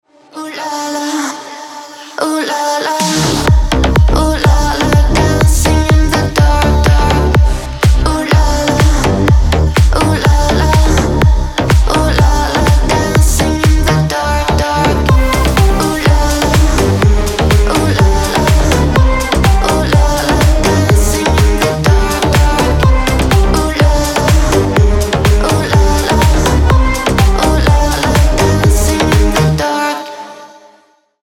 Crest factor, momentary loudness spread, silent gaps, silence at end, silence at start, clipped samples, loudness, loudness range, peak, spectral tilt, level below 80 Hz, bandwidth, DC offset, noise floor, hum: 10 dB; 4 LU; none; 0.75 s; 0.35 s; under 0.1%; -11 LUFS; 1 LU; 0 dBFS; -5 dB/octave; -14 dBFS; 17 kHz; under 0.1%; -50 dBFS; none